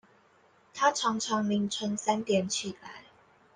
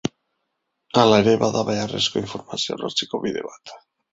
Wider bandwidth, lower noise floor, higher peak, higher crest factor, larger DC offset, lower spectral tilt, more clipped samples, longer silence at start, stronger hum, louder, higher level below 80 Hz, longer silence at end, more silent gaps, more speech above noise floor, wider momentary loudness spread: first, 10 kHz vs 8 kHz; second, -63 dBFS vs -76 dBFS; second, -12 dBFS vs -2 dBFS; about the same, 20 dB vs 20 dB; neither; about the same, -3.5 dB/octave vs -4.5 dB/octave; neither; first, 0.75 s vs 0.05 s; neither; second, -29 LUFS vs -21 LUFS; second, -74 dBFS vs -56 dBFS; first, 0.55 s vs 0.35 s; neither; second, 34 dB vs 55 dB; first, 20 LU vs 15 LU